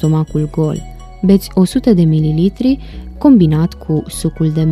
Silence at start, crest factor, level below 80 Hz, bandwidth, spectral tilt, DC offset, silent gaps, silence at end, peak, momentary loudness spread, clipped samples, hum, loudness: 0 s; 12 dB; -32 dBFS; 14 kHz; -8 dB/octave; under 0.1%; none; 0 s; 0 dBFS; 9 LU; under 0.1%; none; -13 LUFS